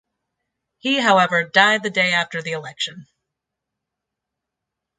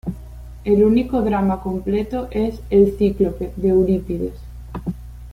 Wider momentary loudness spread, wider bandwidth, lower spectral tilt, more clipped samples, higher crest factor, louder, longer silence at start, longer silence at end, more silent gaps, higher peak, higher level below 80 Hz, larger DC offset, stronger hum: second, 12 LU vs 16 LU; second, 9.4 kHz vs 15 kHz; second, -3.5 dB/octave vs -9 dB/octave; neither; first, 22 dB vs 16 dB; about the same, -18 LUFS vs -19 LUFS; first, 0.85 s vs 0.05 s; first, 1.95 s vs 0 s; neither; about the same, 0 dBFS vs -2 dBFS; second, -72 dBFS vs -34 dBFS; neither; second, none vs 60 Hz at -35 dBFS